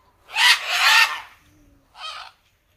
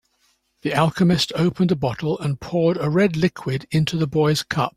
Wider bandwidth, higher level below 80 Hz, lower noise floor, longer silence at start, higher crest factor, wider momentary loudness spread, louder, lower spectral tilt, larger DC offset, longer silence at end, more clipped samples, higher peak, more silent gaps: about the same, 16.5 kHz vs 15 kHz; second, -64 dBFS vs -50 dBFS; second, -56 dBFS vs -65 dBFS; second, 0.3 s vs 0.65 s; about the same, 22 dB vs 18 dB; first, 21 LU vs 6 LU; first, -16 LUFS vs -21 LUFS; second, 3.5 dB/octave vs -6 dB/octave; neither; first, 0.55 s vs 0.05 s; neither; about the same, -2 dBFS vs -2 dBFS; neither